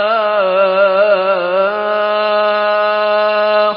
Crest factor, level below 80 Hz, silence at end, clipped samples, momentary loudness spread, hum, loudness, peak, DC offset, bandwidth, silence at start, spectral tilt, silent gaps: 12 dB; -64 dBFS; 0 s; under 0.1%; 3 LU; none; -13 LUFS; -2 dBFS; under 0.1%; 5.4 kHz; 0 s; -9 dB/octave; none